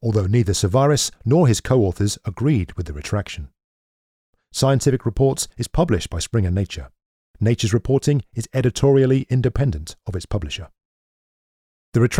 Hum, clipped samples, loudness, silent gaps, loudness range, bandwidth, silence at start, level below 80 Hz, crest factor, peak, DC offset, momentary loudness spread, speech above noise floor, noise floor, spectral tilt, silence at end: none; under 0.1%; -20 LUFS; 3.64-4.33 s, 7.06-7.34 s, 10.85-11.92 s; 4 LU; 15.5 kHz; 0 s; -38 dBFS; 16 dB; -4 dBFS; under 0.1%; 13 LU; over 71 dB; under -90 dBFS; -6 dB/octave; 0 s